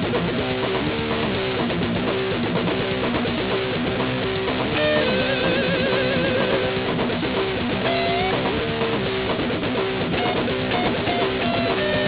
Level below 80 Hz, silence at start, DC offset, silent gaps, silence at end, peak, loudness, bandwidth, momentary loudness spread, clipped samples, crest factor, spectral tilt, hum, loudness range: -42 dBFS; 0 s; under 0.1%; none; 0 s; -6 dBFS; -22 LUFS; 4 kHz; 3 LU; under 0.1%; 16 dB; -9.5 dB/octave; none; 2 LU